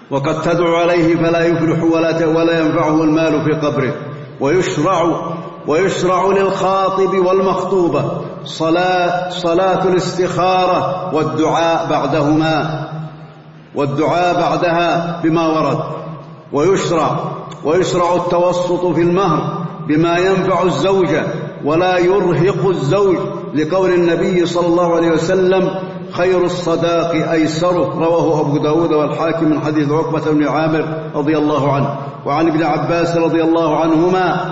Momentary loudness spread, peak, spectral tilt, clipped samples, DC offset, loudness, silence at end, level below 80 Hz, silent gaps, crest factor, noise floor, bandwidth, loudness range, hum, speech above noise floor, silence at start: 7 LU; -4 dBFS; -6.5 dB/octave; under 0.1%; under 0.1%; -15 LUFS; 0 s; -46 dBFS; none; 10 dB; -38 dBFS; 8 kHz; 2 LU; none; 23 dB; 0 s